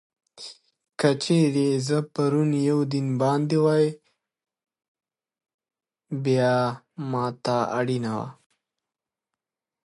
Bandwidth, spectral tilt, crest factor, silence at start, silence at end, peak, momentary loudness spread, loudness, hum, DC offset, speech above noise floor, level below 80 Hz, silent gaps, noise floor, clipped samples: 11.5 kHz; -6.5 dB/octave; 20 dB; 0.35 s; 1.55 s; -6 dBFS; 14 LU; -24 LUFS; none; under 0.1%; 66 dB; -70 dBFS; 4.88-4.95 s, 5.54-5.59 s; -89 dBFS; under 0.1%